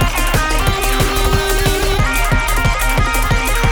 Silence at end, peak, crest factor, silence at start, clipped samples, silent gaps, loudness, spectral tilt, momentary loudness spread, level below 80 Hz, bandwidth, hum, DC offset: 0 s; 0 dBFS; 14 dB; 0 s; under 0.1%; none; -15 LUFS; -4 dB/octave; 1 LU; -18 dBFS; over 20 kHz; none; under 0.1%